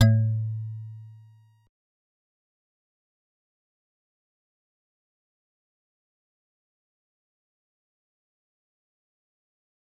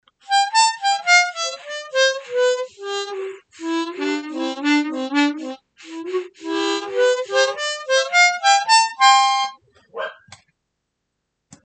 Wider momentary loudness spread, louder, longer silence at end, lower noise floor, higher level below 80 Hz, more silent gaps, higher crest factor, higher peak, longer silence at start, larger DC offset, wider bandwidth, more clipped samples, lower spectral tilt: first, 23 LU vs 17 LU; second, -27 LUFS vs -18 LUFS; first, 8.85 s vs 1.5 s; second, -55 dBFS vs -76 dBFS; first, -62 dBFS vs -80 dBFS; neither; first, 26 dB vs 18 dB; second, -6 dBFS vs -2 dBFS; second, 0 s vs 0.3 s; neither; second, 7.8 kHz vs 9.4 kHz; neither; first, -7 dB/octave vs 0.5 dB/octave